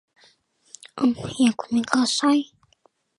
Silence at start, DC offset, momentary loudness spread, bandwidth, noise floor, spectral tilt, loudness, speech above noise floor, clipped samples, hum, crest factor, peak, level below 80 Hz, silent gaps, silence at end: 0.95 s; under 0.1%; 9 LU; 11.5 kHz; -63 dBFS; -3.5 dB/octave; -22 LUFS; 42 dB; under 0.1%; none; 22 dB; -2 dBFS; -64 dBFS; none; 0.75 s